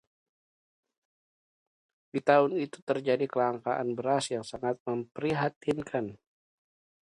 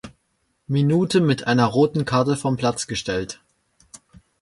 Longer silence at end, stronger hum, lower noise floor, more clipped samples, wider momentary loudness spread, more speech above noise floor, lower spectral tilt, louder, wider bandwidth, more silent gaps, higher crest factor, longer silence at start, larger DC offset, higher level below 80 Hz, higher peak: second, 0.9 s vs 1.05 s; neither; first, under -90 dBFS vs -70 dBFS; neither; about the same, 10 LU vs 9 LU; first, over 61 dB vs 50 dB; about the same, -5.5 dB/octave vs -6 dB/octave; second, -30 LUFS vs -21 LUFS; about the same, 11.5 kHz vs 11.5 kHz; first, 2.82-2.87 s, 4.80-4.86 s, 5.56-5.61 s vs none; first, 24 dB vs 18 dB; first, 2.15 s vs 0.05 s; neither; second, -70 dBFS vs -52 dBFS; second, -8 dBFS vs -4 dBFS